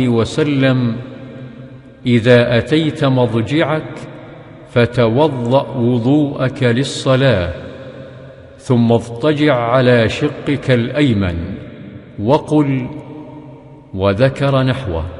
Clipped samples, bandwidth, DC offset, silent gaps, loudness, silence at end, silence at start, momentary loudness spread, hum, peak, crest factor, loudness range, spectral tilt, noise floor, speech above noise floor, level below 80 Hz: under 0.1%; 11 kHz; under 0.1%; none; -15 LUFS; 0 s; 0 s; 20 LU; none; 0 dBFS; 16 dB; 3 LU; -7 dB/octave; -37 dBFS; 23 dB; -40 dBFS